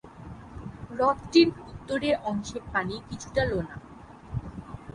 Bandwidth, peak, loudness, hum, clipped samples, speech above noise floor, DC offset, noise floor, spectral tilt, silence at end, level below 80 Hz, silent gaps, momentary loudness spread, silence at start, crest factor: 11 kHz; -6 dBFS; -27 LUFS; none; under 0.1%; 20 dB; under 0.1%; -46 dBFS; -5.5 dB/octave; 0.05 s; -48 dBFS; none; 22 LU; 0.05 s; 22 dB